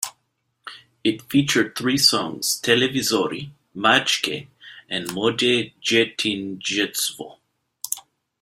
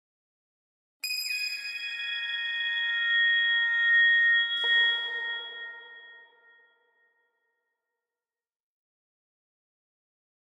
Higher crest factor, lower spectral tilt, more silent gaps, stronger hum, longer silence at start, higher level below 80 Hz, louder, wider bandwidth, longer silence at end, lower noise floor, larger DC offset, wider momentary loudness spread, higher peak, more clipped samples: first, 22 dB vs 16 dB; first, -2.5 dB/octave vs 5.5 dB/octave; neither; neither; second, 0 s vs 1.05 s; first, -62 dBFS vs under -90 dBFS; first, -21 LUFS vs -24 LUFS; about the same, 16 kHz vs 15.5 kHz; second, 0.4 s vs 4.3 s; second, -72 dBFS vs under -90 dBFS; neither; first, 18 LU vs 15 LU; first, -2 dBFS vs -16 dBFS; neither